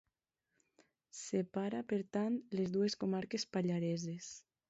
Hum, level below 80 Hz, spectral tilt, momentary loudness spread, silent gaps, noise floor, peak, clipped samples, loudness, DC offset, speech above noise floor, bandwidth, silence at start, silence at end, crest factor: none; -78 dBFS; -6 dB/octave; 11 LU; none; -88 dBFS; -24 dBFS; under 0.1%; -38 LUFS; under 0.1%; 50 dB; 8 kHz; 1.15 s; 0.3 s; 16 dB